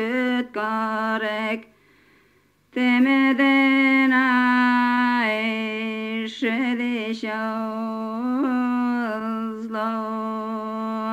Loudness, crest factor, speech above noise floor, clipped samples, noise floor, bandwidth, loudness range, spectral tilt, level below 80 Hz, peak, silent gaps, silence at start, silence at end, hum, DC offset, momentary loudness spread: -22 LUFS; 16 dB; 39 dB; under 0.1%; -61 dBFS; 8.6 kHz; 7 LU; -5.5 dB/octave; -70 dBFS; -6 dBFS; none; 0 s; 0 s; 50 Hz at -70 dBFS; under 0.1%; 11 LU